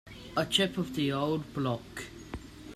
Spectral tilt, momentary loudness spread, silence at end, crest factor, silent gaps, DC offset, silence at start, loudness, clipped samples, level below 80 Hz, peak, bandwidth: -4.5 dB/octave; 17 LU; 0 s; 22 dB; none; under 0.1%; 0.05 s; -31 LUFS; under 0.1%; -54 dBFS; -10 dBFS; 15 kHz